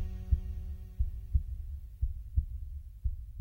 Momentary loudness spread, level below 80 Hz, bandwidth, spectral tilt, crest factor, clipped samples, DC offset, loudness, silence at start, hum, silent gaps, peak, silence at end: 10 LU; -36 dBFS; 2.9 kHz; -9 dB/octave; 20 dB; under 0.1%; under 0.1%; -38 LUFS; 0 s; none; none; -14 dBFS; 0 s